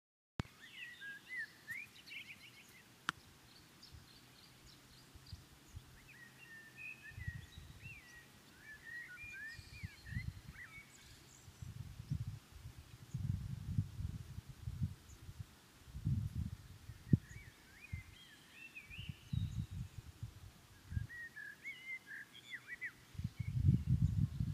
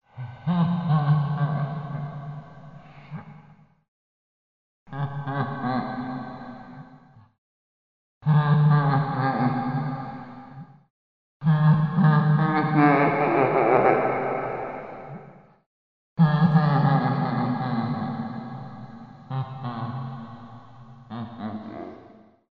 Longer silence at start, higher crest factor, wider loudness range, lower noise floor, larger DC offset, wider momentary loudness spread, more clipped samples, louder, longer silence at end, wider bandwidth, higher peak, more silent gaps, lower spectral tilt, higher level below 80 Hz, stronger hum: first, 0.4 s vs 0.15 s; first, 30 dB vs 20 dB; second, 10 LU vs 15 LU; first, -63 dBFS vs -53 dBFS; second, under 0.1% vs 0.1%; about the same, 20 LU vs 22 LU; neither; second, -45 LUFS vs -23 LUFS; second, 0 s vs 0.55 s; first, 15.5 kHz vs 4.9 kHz; second, -16 dBFS vs -6 dBFS; second, none vs 3.88-4.86 s, 7.38-8.21 s, 10.90-11.40 s, 15.66-16.16 s; second, -6 dB/octave vs -10.5 dB/octave; first, -56 dBFS vs -62 dBFS; neither